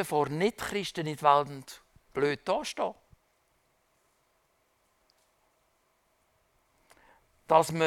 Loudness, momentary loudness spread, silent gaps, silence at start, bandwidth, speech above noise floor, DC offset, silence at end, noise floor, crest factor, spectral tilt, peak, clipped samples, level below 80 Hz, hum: -29 LUFS; 15 LU; none; 0 s; 17.5 kHz; 44 dB; under 0.1%; 0 s; -72 dBFS; 24 dB; -4.5 dB/octave; -8 dBFS; under 0.1%; -66 dBFS; none